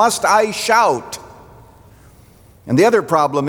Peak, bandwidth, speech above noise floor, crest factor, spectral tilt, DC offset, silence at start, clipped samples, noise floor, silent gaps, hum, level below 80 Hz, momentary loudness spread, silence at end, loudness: -2 dBFS; over 20 kHz; 31 dB; 16 dB; -4 dB/octave; under 0.1%; 0 s; under 0.1%; -46 dBFS; none; none; -54 dBFS; 12 LU; 0 s; -15 LUFS